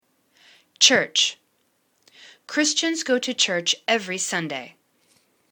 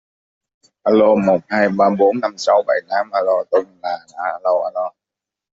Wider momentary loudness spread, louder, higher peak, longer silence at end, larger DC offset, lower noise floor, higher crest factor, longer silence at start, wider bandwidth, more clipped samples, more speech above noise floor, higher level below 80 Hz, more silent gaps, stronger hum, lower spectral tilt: about the same, 11 LU vs 12 LU; second, -21 LUFS vs -17 LUFS; about the same, -2 dBFS vs -2 dBFS; first, 0.8 s vs 0.65 s; neither; second, -68 dBFS vs -86 dBFS; first, 24 dB vs 16 dB; about the same, 0.8 s vs 0.85 s; first, 19 kHz vs 7.8 kHz; neither; second, 46 dB vs 69 dB; second, -76 dBFS vs -62 dBFS; neither; neither; second, -1 dB/octave vs -6 dB/octave